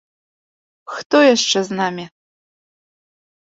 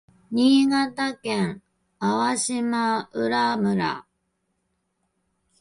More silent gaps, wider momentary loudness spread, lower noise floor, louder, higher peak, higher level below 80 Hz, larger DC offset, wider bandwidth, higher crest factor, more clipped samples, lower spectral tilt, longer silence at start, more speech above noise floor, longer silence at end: first, 1.05-1.10 s vs none; first, 19 LU vs 10 LU; first, under -90 dBFS vs -74 dBFS; first, -16 LUFS vs -23 LUFS; first, -2 dBFS vs -8 dBFS; about the same, -68 dBFS vs -64 dBFS; neither; second, 8 kHz vs 11.5 kHz; about the same, 20 dB vs 16 dB; neither; second, -3 dB/octave vs -4.5 dB/octave; first, 0.9 s vs 0.3 s; first, over 74 dB vs 52 dB; second, 1.35 s vs 1.6 s